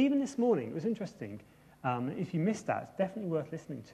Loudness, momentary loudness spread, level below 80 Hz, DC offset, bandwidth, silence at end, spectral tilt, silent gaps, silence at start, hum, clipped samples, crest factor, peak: -34 LUFS; 12 LU; -72 dBFS; under 0.1%; 13 kHz; 0 s; -7 dB/octave; none; 0 s; none; under 0.1%; 16 dB; -18 dBFS